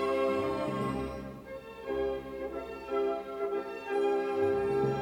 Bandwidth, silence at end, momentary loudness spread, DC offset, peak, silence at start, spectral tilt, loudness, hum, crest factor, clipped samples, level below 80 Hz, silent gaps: 12.5 kHz; 0 s; 12 LU; under 0.1%; -18 dBFS; 0 s; -7 dB/octave; -33 LUFS; none; 14 dB; under 0.1%; -56 dBFS; none